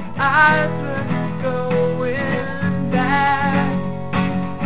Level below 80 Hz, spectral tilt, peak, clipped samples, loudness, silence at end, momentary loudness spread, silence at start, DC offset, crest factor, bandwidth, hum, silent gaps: -44 dBFS; -10.5 dB/octave; -2 dBFS; under 0.1%; -19 LUFS; 0 s; 9 LU; 0 s; 3%; 16 dB; 4 kHz; none; none